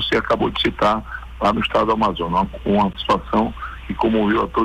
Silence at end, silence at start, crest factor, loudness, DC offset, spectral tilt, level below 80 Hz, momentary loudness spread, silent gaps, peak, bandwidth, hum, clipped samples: 0 s; 0 s; 12 dB; -19 LUFS; under 0.1%; -6.5 dB/octave; -36 dBFS; 6 LU; none; -8 dBFS; 11 kHz; none; under 0.1%